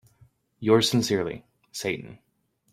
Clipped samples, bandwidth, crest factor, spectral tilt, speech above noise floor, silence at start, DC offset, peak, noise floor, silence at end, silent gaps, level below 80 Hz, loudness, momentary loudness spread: under 0.1%; 16 kHz; 20 dB; -4.5 dB/octave; 36 dB; 0.6 s; under 0.1%; -8 dBFS; -60 dBFS; 0.55 s; none; -62 dBFS; -25 LUFS; 20 LU